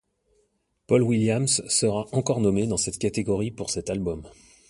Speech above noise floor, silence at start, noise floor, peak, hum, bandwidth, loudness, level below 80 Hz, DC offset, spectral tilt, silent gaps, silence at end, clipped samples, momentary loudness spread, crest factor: 46 dB; 0.9 s; -70 dBFS; -6 dBFS; none; 11.5 kHz; -24 LUFS; -50 dBFS; under 0.1%; -4.5 dB/octave; none; 0.4 s; under 0.1%; 8 LU; 20 dB